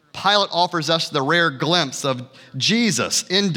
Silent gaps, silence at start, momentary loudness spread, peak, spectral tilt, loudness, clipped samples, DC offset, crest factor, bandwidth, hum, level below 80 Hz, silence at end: none; 0.15 s; 7 LU; -2 dBFS; -3 dB/octave; -19 LUFS; under 0.1%; under 0.1%; 18 dB; 18.5 kHz; none; -70 dBFS; 0 s